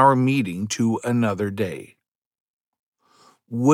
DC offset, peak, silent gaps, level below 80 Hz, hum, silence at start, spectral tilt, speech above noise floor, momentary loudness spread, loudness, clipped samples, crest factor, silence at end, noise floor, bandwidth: under 0.1%; -4 dBFS; 2.08-2.31 s, 2.40-2.73 s, 2.79-2.92 s; -70 dBFS; none; 0 s; -6 dB/octave; 36 dB; 9 LU; -23 LUFS; under 0.1%; 20 dB; 0 s; -57 dBFS; 15 kHz